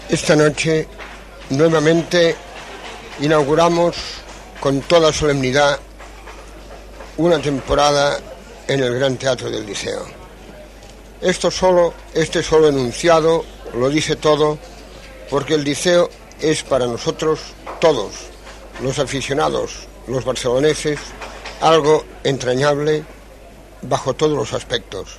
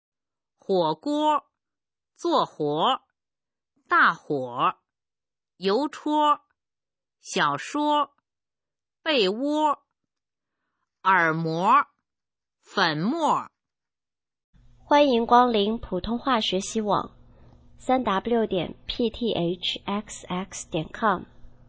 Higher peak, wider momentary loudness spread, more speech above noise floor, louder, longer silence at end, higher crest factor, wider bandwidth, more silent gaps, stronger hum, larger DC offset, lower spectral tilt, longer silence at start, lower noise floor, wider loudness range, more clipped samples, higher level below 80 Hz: first, 0 dBFS vs -4 dBFS; first, 21 LU vs 12 LU; second, 23 dB vs over 66 dB; first, -17 LUFS vs -24 LUFS; second, 0 s vs 0.2 s; about the same, 18 dB vs 22 dB; first, 13 kHz vs 8 kHz; second, none vs 14.44-14.53 s; neither; neither; about the same, -4.5 dB/octave vs -4.5 dB/octave; second, 0 s vs 0.7 s; second, -40 dBFS vs under -90 dBFS; about the same, 4 LU vs 4 LU; neither; first, -40 dBFS vs -56 dBFS